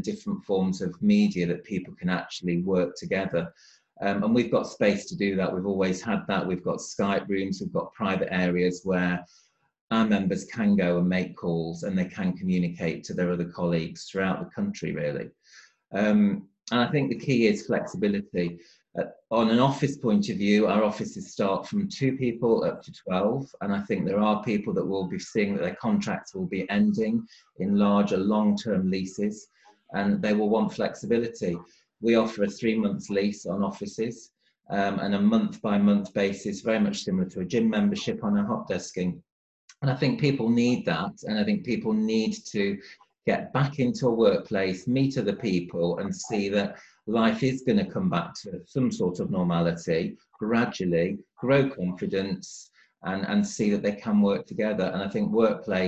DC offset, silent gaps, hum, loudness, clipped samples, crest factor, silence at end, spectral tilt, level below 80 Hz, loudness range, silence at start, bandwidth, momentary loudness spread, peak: under 0.1%; 9.81-9.88 s, 39.32-39.68 s; none; -27 LUFS; under 0.1%; 18 dB; 0 s; -6.5 dB/octave; -58 dBFS; 2 LU; 0 s; 8.2 kHz; 9 LU; -8 dBFS